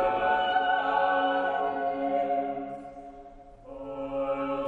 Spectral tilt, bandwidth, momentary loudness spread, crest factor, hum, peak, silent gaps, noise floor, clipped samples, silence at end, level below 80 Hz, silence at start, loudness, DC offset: -6 dB/octave; 4.8 kHz; 19 LU; 16 dB; none; -12 dBFS; none; -48 dBFS; under 0.1%; 0 s; -56 dBFS; 0 s; -28 LUFS; under 0.1%